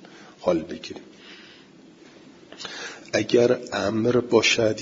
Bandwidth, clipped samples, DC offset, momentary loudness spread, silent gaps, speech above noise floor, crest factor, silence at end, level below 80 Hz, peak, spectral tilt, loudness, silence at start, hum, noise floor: 7.8 kHz; under 0.1%; under 0.1%; 24 LU; none; 27 dB; 20 dB; 0 s; -62 dBFS; -6 dBFS; -4 dB/octave; -22 LUFS; 0.1 s; none; -50 dBFS